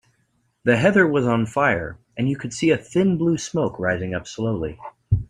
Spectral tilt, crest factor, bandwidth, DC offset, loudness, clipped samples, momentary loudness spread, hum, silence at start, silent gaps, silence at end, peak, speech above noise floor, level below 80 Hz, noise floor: -6 dB/octave; 18 dB; 11 kHz; under 0.1%; -21 LUFS; under 0.1%; 10 LU; none; 0.65 s; none; 0.05 s; -2 dBFS; 46 dB; -44 dBFS; -67 dBFS